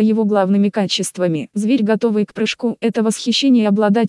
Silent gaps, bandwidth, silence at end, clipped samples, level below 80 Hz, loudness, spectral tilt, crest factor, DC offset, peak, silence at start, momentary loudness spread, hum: none; 12 kHz; 0 s; under 0.1%; -70 dBFS; -17 LUFS; -5.5 dB/octave; 12 dB; under 0.1%; -4 dBFS; 0 s; 6 LU; none